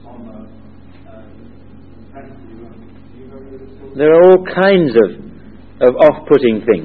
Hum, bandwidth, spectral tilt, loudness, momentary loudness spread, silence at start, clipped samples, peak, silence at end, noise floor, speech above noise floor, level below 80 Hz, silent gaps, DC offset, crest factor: none; 4.8 kHz; -9 dB/octave; -11 LUFS; 27 LU; 0.2 s; 0.1%; 0 dBFS; 0 s; -39 dBFS; 26 dB; -46 dBFS; none; 1%; 14 dB